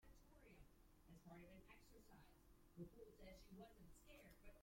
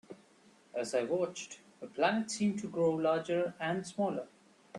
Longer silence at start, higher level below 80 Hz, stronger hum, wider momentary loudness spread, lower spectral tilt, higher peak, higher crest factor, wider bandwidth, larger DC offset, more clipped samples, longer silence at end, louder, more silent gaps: about the same, 0 s vs 0.1 s; about the same, -72 dBFS vs -76 dBFS; neither; second, 7 LU vs 14 LU; about the same, -5.5 dB/octave vs -5 dB/octave; second, -46 dBFS vs -16 dBFS; about the same, 18 dB vs 20 dB; first, 16.5 kHz vs 11.5 kHz; neither; neither; about the same, 0 s vs 0 s; second, -65 LUFS vs -34 LUFS; neither